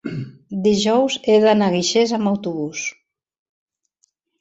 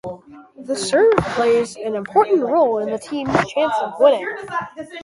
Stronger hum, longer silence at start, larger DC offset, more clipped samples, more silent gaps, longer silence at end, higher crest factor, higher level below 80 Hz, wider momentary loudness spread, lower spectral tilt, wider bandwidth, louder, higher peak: neither; about the same, 0.05 s vs 0.05 s; neither; neither; neither; first, 1.5 s vs 0 s; about the same, 16 dB vs 18 dB; second, -60 dBFS vs -50 dBFS; first, 14 LU vs 11 LU; about the same, -4.5 dB/octave vs -5 dB/octave; second, 8 kHz vs 11.5 kHz; about the same, -18 LUFS vs -18 LUFS; second, -4 dBFS vs 0 dBFS